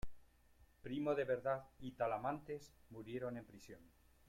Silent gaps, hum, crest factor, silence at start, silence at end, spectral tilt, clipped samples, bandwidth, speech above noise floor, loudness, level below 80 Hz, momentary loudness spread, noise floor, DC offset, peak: none; none; 18 dB; 0.05 s; 0 s; -7 dB/octave; under 0.1%; 16.5 kHz; 26 dB; -43 LUFS; -64 dBFS; 19 LU; -69 dBFS; under 0.1%; -26 dBFS